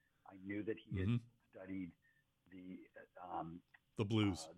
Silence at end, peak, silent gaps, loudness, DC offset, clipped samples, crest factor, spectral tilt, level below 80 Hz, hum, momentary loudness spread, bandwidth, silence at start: 0 s; -24 dBFS; none; -43 LUFS; under 0.1%; under 0.1%; 20 dB; -6.5 dB/octave; -72 dBFS; none; 21 LU; 12 kHz; 0.25 s